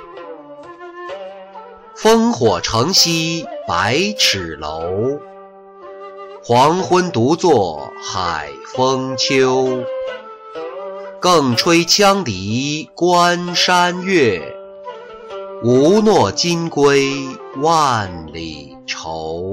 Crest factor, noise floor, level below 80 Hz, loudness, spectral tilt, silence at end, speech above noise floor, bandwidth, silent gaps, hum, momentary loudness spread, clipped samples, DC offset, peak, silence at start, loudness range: 14 dB; -39 dBFS; -48 dBFS; -15 LUFS; -4 dB/octave; 0 s; 24 dB; 16 kHz; none; none; 21 LU; under 0.1%; under 0.1%; -2 dBFS; 0 s; 4 LU